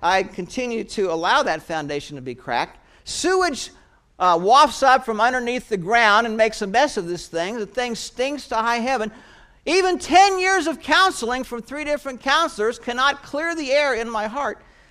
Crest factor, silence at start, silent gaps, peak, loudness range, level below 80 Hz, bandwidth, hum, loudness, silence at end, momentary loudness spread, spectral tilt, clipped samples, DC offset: 20 dB; 0 s; none; -2 dBFS; 6 LU; -50 dBFS; 15 kHz; none; -20 LUFS; 0.35 s; 13 LU; -3 dB/octave; under 0.1%; under 0.1%